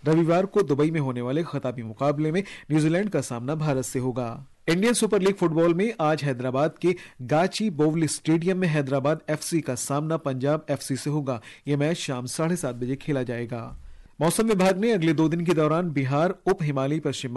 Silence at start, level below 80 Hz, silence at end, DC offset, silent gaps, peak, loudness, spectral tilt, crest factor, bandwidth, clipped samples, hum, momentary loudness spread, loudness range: 0.05 s; -56 dBFS; 0 s; under 0.1%; none; -12 dBFS; -25 LUFS; -6 dB/octave; 12 dB; 12.5 kHz; under 0.1%; none; 8 LU; 4 LU